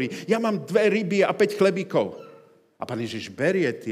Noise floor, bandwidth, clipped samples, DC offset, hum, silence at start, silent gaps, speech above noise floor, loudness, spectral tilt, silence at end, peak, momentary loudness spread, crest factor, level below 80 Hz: -53 dBFS; 15 kHz; under 0.1%; under 0.1%; none; 0 s; none; 29 dB; -24 LUFS; -6 dB/octave; 0 s; -6 dBFS; 11 LU; 18 dB; -78 dBFS